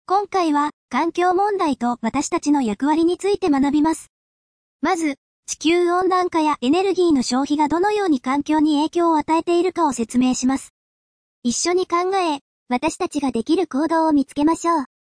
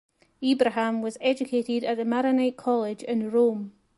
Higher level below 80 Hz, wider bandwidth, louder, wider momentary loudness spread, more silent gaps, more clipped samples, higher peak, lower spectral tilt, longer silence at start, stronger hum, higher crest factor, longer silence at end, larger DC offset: first, -54 dBFS vs -72 dBFS; about the same, 10.5 kHz vs 11.5 kHz; first, -20 LUFS vs -25 LUFS; about the same, 5 LU vs 5 LU; first, 0.73-0.89 s, 4.09-4.79 s, 5.18-5.43 s, 10.70-11.42 s, 12.41-12.66 s vs none; neither; about the same, -8 dBFS vs -8 dBFS; second, -3.5 dB/octave vs -5.5 dB/octave; second, 0.1 s vs 0.4 s; neither; second, 12 dB vs 18 dB; about the same, 0.2 s vs 0.25 s; neither